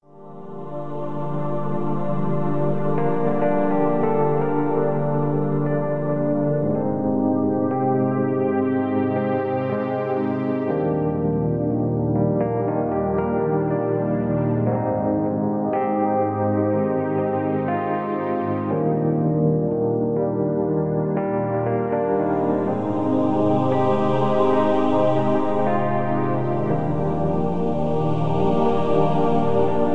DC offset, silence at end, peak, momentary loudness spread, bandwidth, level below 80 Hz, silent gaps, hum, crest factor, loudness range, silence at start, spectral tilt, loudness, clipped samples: under 0.1%; 0 s; -6 dBFS; 4 LU; 6.2 kHz; -48 dBFS; none; none; 14 dB; 2 LU; 0 s; -10 dB/octave; -22 LUFS; under 0.1%